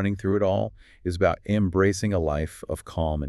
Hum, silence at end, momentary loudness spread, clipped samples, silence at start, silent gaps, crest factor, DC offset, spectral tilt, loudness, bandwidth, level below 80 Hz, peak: none; 0 s; 10 LU; under 0.1%; 0 s; none; 16 dB; under 0.1%; -6.5 dB/octave; -25 LUFS; 12.5 kHz; -40 dBFS; -8 dBFS